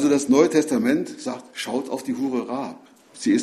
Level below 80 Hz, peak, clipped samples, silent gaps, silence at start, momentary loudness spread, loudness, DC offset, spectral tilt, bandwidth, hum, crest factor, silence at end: -64 dBFS; -4 dBFS; under 0.1%; none; 0 s; 14 LU; -23 LUFS; under 0.1%; -4.5 dB/octave; 14 kHz; none; 18 dB; 0 s